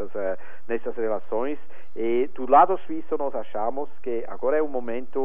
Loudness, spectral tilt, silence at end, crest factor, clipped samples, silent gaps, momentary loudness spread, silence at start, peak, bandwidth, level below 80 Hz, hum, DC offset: -26 LUFS; -8.5 dB/octave; 0 s; 20 dB; under 0.1%; none; 13 LU; 0 s; -4 dBFS; 3.8 kHz; -62 dBFS; none; 6%